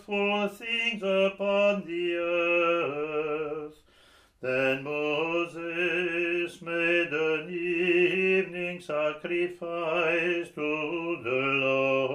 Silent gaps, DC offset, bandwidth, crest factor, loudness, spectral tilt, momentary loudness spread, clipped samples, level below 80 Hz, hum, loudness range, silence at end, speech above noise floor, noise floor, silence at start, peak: none; under 0.1%; 10.5 kHz; 14 dB; -27 LUFS; -5.5 dB/octave; 7 LU; under 0.1%; -70 dBFS; none; 3 LU; 0 s; 32 dB; -59 dBFS; 0.1 s; -14 dBFS